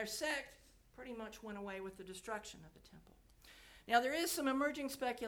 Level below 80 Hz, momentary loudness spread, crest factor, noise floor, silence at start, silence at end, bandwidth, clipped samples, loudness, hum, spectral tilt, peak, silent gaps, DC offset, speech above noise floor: -68 dBFS; 23 LU; 24 dB; -62 dBFS; 0 s; 0 s; over 20 kHz; under 0.1%; -40 LUFS; none; -2.5 dB/octave; -18 dBFS; none; under 0.1%; 22 dB